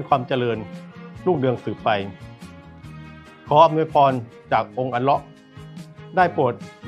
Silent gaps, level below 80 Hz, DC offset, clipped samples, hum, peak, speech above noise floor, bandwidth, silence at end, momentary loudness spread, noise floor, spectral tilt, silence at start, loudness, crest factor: none; -56 dBFS; under 0.1%; under 0.1%; none; -2 dBFS; 21 dB; 11 kHz; 0 s; 24 LU; -41 dBFS; -7.5 dB/octave; 0 s; -21 LUFS; 20 dB